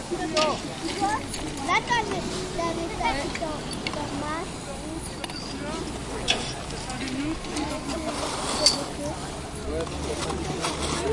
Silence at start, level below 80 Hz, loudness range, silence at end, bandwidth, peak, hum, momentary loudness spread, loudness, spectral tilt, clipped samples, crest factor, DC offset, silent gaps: 0 s; -42 dBFS; 4 LU; 0 s; 11.5 kHz; -2 dBFS; none; 9 LU; -28 LUFS; -3.5 dB/octave; under 0.1%; 26 dB; under 0.1%; none